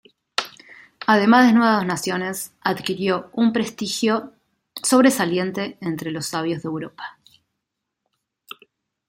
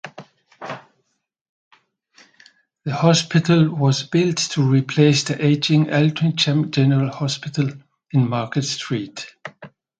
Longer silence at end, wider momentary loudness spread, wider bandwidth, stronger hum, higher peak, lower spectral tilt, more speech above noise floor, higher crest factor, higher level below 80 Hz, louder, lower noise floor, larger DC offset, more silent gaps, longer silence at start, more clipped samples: first, 2 s vs 0.35 s; first, 21 LU vs 18 LU; first, 16.5 kHz vs 9.2 kHz; neither; about the same, -2 dBFS vs 0 dBFS; second, -4 dB/octave vs -5.5 dB/octave; first, 61 dB vs 54 dB; about the same, 20 dB vs 20 dB; second, -66 dBFS vs -60 dBFS; about the same, -20 LUFS vs -19 LUFS; first, -80 dBFS vs -73 dBFS; neither; second, none vs 1.41-1.71 s; first, 0.4 s vs 0.05 s; neither